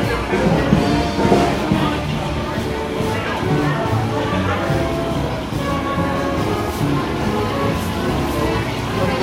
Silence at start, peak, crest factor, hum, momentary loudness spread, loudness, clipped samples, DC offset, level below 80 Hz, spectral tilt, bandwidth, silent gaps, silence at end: 0 s; 0 dBFS; 18 dB; none; 6 LU; -19 LUFS; under 0.1%; under 0.1%; -32 dBFS; -6 dB/octave; 16 kHz; none; 0 s